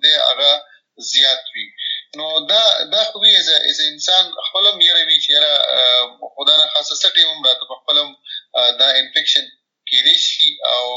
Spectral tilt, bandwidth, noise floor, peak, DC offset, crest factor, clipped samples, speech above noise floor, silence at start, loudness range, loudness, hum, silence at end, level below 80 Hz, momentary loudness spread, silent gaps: 1.5 dB/octave; 8 kHz; -36 dBFS; 0 dBFS; under 0.1%; 16 dB; under 0.1%; 21 dB; 0 s; 2 LU; -12 LUFS; none; 0 s; under -90 dBFS; 12 LU; none